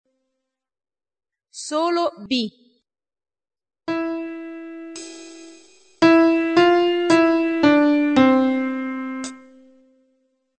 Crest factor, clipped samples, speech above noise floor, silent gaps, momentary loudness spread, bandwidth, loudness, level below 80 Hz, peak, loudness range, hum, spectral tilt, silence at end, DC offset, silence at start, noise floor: 18 dB; under 0.1%; over 67 dB; none; 20 LU; 9 kHz; -18 LUFS; -62 dBFS; -2 dBFS; 13 LU; none; -4.5 dB/octave; 1.2 s; under 0.1%; 1.55 s; under -90 dBFS